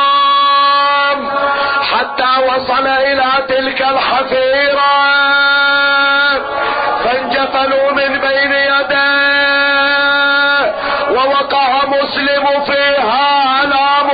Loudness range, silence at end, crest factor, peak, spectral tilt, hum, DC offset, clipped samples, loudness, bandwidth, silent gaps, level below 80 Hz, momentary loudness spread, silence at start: 2 LU; 0 s; 10 dB; -2 dBFS; -6 dB/octave; none; under 0.1%; under 0.1%; -11 LUFS; 5 kHz; none; -48 dBFS; 5 LU; 0 s